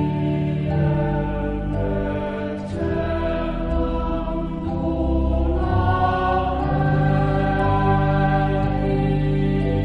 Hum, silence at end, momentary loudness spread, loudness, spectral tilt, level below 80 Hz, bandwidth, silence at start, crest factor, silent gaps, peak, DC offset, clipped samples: none; 0 s; 6 LU; -22 LUFS; -9.5 dB/octave; -28 dBFS; 5.2 kHz; 0 s; 14 dB; none; -6 dBFS; under 0.1%; under 0.1%